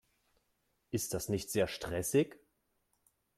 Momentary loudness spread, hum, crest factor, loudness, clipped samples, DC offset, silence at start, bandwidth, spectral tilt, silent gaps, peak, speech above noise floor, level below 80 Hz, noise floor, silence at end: 7 LU; none; 20 dB; -35 LUFS; under 0.1%; under 0.1%; 0.9 s; 16 kHz; -4.5 dB/octave; none; -18 dBFS; 45 dB; -62 dBFS; -79 dBFS; 1 s